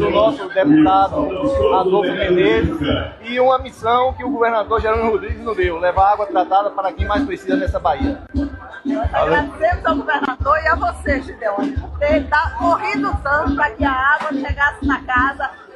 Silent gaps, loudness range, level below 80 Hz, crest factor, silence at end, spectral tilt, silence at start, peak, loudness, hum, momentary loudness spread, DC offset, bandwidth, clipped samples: none; 3 LU; -32 dBFS; 14 dB; 0.1 s; -7 dB/octave; 0 s; -2 dBFS; -17 LUFS; none; 7 LU; under 0.1%; 11.5 kHz; under 0.1%